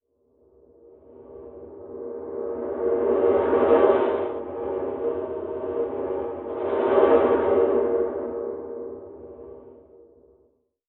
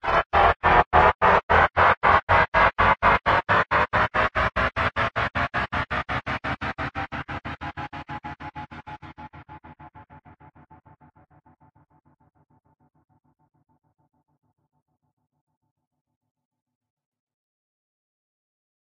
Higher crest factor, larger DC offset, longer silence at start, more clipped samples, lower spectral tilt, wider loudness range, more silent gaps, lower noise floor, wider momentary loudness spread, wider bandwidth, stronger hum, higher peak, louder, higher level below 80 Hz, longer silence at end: about the same, 20 dB vs 22 dB; neither; first, 1.2 s vs 0.05 s; neither; about the same, -5.5 dB/octave vs -6 dB/octave; second, 5 LU vs 21 LU; second, none vs 0.26-0.30 s, 0.56-0.60 s, 0.86-0.91 s, 1.15-1.19 s, 1.43-1.49 s, 1.97-2.01 s, 2.23-2.27 s, 2.48-2.52 s; first, -65 dBFS vs -56 dBFS; first, 24 LU vs 20 LU; second, 4 kHz vs 9.8 kHz; neither; about the same, -4 dBFS vs -4 dBFS; about the same, -23 LUFS vs -21 LUFS; second, -56 dBFS vs -40 dBFS; second, 1.1 s vs 8.85 s